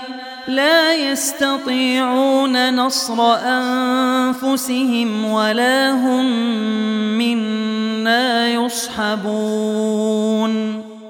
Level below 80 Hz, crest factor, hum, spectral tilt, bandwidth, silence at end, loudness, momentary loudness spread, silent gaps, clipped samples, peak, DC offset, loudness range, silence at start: -64 dBFS; 16 dB; none; -3.5 dB/octave; 17.5 kHz; 0 s; -17 LUFS; 6 LU; none; under 0.1%; -2 dBFS; under 0.1%; 2 LU; 0 s